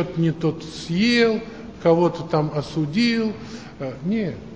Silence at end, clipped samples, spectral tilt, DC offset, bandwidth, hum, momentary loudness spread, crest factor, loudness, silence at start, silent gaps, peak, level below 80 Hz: 0 s; under 0.1%; -6.5 dB/octave; 0.2%; 8 kHz; none; 14 LU; 18 dB; -22 LUFS; 0 s; none; -4 dBFS; -50 dBFS